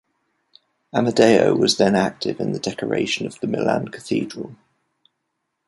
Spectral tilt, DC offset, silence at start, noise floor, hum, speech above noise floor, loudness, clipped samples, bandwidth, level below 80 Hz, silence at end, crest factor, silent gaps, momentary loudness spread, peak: -5 dB/octave; under 0.1%; 0.95 s; -76 dBFS; none; 57 dB; -20 LUFS; under 0.1%; 11.5 kHz; -58 dBFS; 1.15 s; 20 dB; none; 11 LU; 0 dBFS